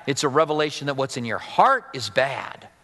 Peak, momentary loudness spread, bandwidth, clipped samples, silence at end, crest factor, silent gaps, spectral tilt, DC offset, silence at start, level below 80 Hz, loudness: -2 dBFS; 9 LU; 12 kHz; under 0.1%; 0.15 s; 20 dB; none; -4 dB/octave; under 0.1%; 0 s; -66 dBFS; -22 LUFS